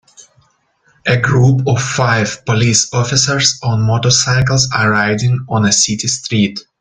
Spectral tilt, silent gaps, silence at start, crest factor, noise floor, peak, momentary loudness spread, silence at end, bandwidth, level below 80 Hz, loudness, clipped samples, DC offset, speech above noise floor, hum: -3.5 dB/octave; none; 0.2 s; 14 dB; -57 dBFS; 0 dBFS; 5 LU; 0.2 s; 9.6 kHz; -44 dBFS; -13 LUFS; under 0.1%; under 0.1%; 43 dB; none